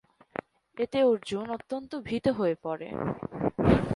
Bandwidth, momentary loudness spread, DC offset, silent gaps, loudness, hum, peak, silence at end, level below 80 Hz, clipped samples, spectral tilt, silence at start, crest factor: 11.5 kHz; 16 LU; under 0.1%; none; -29 LUFS; none; -6 dBFS; 0 s; -48 dBFS; under 0.1%; -7.5 dB/octave; 0.75 s; 22 dB